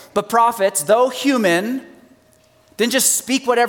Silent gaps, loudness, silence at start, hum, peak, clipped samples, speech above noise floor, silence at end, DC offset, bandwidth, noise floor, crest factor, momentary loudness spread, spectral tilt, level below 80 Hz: none; -17 LUFS; 0.15 s; none; -2 dBFS; under 0.1%; 37 dB; 0 s; under 0.1%; 19.5 kHz; -54 dBFS; 16 dB; 6 LU; -2.5 dB/octave; -66 dBFS